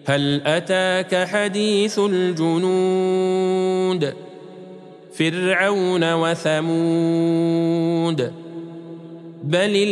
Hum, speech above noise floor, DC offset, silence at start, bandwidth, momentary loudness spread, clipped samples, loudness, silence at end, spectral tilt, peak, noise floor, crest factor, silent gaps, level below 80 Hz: none; 21 dB; under 0.1%; 0.05 s; 11.5 kHz; 18 LU; under 0.1%; -20 LUFS; 0 s; -5.5 dB/octave; -4 dBFS; -40 dBFS; 16 dB; none; -72 dBFS